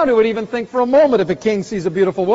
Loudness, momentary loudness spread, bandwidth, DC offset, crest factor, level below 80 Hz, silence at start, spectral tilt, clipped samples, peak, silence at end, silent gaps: -16 LUFS; 9 LU; 8 kHz; under 0.1%; 12 dB; -52 dBFS; 0 s; -5 dB/octave; under 0.1%; -4 dBFS; 0 s; none